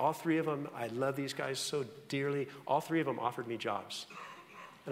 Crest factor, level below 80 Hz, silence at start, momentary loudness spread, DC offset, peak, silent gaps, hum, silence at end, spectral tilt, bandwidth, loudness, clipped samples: 20 dB; -82 dBFS; 0 s; 15 LU; under 0.1%; -18 dBFS; none; none; 0 s; -5 dB/octave; 16 kHz; -36 LUFS; under 0.1%